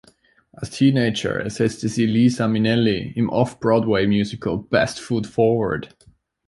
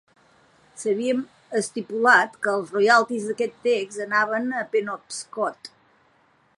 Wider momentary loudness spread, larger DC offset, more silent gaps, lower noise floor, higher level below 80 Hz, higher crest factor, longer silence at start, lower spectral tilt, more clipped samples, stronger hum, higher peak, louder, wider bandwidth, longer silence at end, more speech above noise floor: second, 8 LU vs 13 LU; neither; neither; second, -56 dBFS vs -62 dBFS; first, -50 dBFS vs -78 dBFS; about the same, 18 dB vs 20 dB; second, 0.6 s vs 0.75 s; first, -6.5 dB/octave vs -3.5 dB/octave; neither; neither; about the same, -4 dBFS vs -4 dBFS; first, -20 LUFS vs -23 LUFS; about the same, 11.5 kHz vs 11.5 kHz; second, 0.6 s vs 0.9 s; about the same, 36 dB vs 39 dB